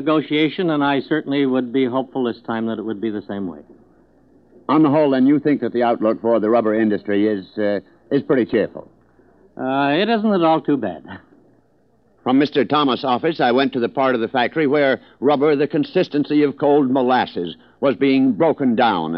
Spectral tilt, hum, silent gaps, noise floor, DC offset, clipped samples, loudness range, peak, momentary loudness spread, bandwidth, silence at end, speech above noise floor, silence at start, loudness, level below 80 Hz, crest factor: -8.5 dB/octave; none; none; -59 dBFS; under 0.1%; under 0.1%; 4 LU; -4 dBFS; 9 LU; 5.8 kHz; 0 s; 41 dB; 0 s; -18 LUFS; -64 dBFS; 16 dB